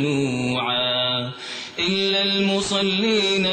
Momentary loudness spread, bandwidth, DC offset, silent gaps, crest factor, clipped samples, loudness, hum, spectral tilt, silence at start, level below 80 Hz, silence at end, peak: 7 LU; 9.2 kHz; under 0.1%; none; 12 dB; under 0.1%; -20 LUFS; none; -4 dB/octave; 0 s; -56 dBFS; 0 s; -10 dBFS